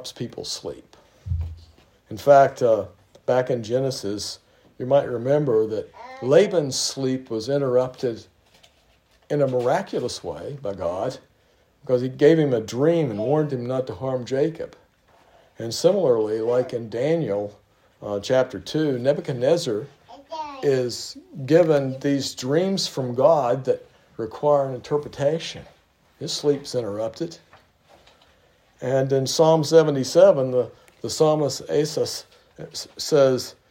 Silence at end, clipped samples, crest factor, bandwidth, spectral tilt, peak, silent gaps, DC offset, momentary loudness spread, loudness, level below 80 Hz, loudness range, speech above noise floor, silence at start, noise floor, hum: 0.2 s; under 0.1%; 20 dB; 16 kHz; -5.5 dB/octave; -2 dBFS; none; under 0.1%; 16 LU; -22 LUFS; -54 dBFS; 6 LU; 39 dB; 0 s; -61 dBFS; none